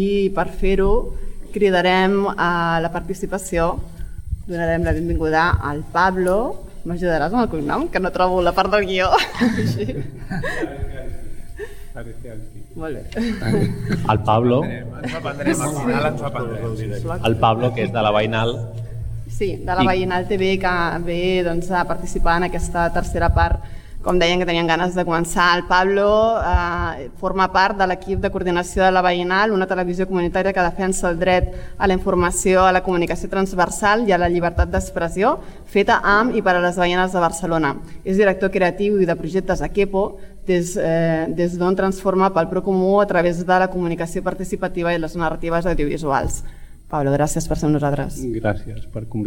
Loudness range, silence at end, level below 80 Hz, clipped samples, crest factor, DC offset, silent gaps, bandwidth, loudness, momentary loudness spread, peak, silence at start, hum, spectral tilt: 4 LU; 0 s; -30 dBFS; under 0.1%; 16 dB; under 0.1%; none; 17 kHz; -19 LUFS; 12 LU; -2 dBFS; 0 s; none; -5.5 dB/octave